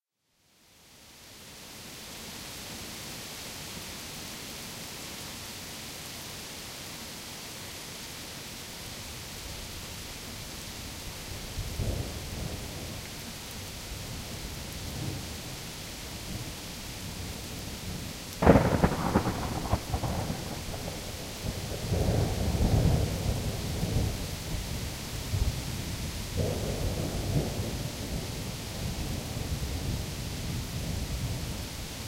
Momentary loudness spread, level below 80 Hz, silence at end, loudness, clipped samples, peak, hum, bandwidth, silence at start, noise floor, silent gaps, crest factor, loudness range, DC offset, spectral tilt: 11 LU; -40 dBFS; 0 s; -34 LUFS; under 0.1%; -4 dBFS; none; 16 kHz; 0.8 s; -71 dBFS; none; 28 dB; 11 LU; under 0.1%; -5 dB/octave